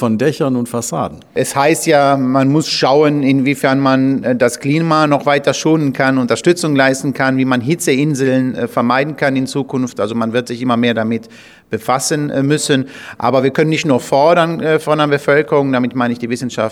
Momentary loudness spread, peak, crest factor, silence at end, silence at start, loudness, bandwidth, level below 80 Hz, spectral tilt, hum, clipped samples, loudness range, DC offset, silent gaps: 7 LU; 0 dBFS; 14 dB; 0 s; 0 s; -14 LUFS; 16 kHz; -58 dBFS; -5 dB/octave; none; under 0.1%; 4 LU; under 0.1%; none